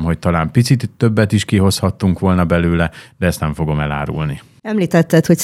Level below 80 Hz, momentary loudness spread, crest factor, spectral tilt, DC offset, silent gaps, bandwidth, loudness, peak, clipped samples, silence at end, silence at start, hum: -34 dBFS; 8 LU; 14 dB; -6.5 dB/octave; under 0.1%; none; 15 kHz; -16 LUFS; 0 dBFS; under 0.1%; 0 s; 0 s; none